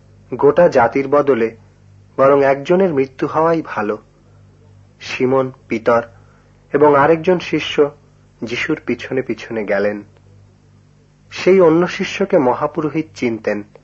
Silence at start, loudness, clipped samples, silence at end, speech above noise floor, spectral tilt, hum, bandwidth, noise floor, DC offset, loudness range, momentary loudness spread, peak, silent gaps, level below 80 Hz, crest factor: 0.3 s; -16 LUFS; under 0.1%; 0.2 s; 34 dB; -6.5 dB/octave; 50 Hz at -50 dBFS; 7.6 kHz; -50 dBFS; under 0.1%; 6 LU; 12 LU; -2 dBFS; none; -52 dBFS; 16 dB